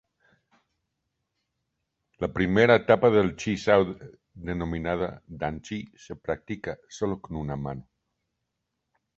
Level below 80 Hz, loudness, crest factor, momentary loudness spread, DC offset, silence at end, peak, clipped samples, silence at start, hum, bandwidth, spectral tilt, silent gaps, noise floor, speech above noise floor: -50 dBFS; -26 LUFS; 24 dB; 17 LU; under 0.1%; 1.35 s; -4 dBFS; under 0.1%; 2.2 s; none; 8 kHz; -6.5 dB/octave; none; -82 dBFS; 56 dB